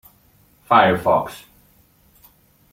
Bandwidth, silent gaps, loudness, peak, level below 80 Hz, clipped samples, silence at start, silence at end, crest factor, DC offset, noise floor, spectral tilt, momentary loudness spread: 16.5 kHz; none; -17 LUFS; -2 dBFS; -54 dBFS; under 0.1%; 0.7 s; 1.35 s; 20 dB; under 0.1%; -56 dBFS; -6 dB/octave; 19 LU